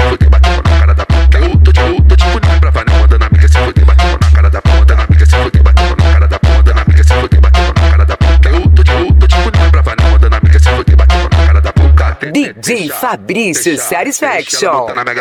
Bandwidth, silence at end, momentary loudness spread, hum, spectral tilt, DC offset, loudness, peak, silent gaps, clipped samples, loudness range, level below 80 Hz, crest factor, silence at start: 13.5 kHz; 0 s; 6 LU; none; -5.5 dB/octave; under 0.1%; -9 LUFS; 0 dBFS; none; 0.6%; 3 LU; -8 dBFS; 6 dB; 0 s